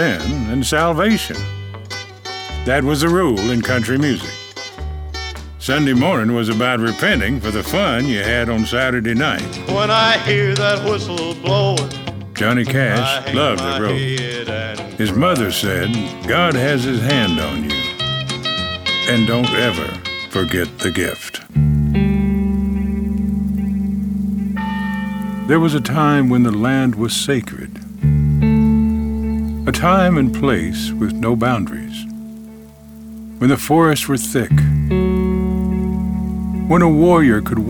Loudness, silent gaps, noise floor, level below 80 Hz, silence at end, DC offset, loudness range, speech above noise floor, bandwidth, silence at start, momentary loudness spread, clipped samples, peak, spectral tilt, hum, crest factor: -17 LUFS; none; -38 dBFS; -32 dBFS; 0 s; under 0.1%; 3 LU; 22 dB; over 20 kHz; 0 s; 12 LU; under 0.1%; -4 dBFS; -5.5 dB/octave; none; 14 dB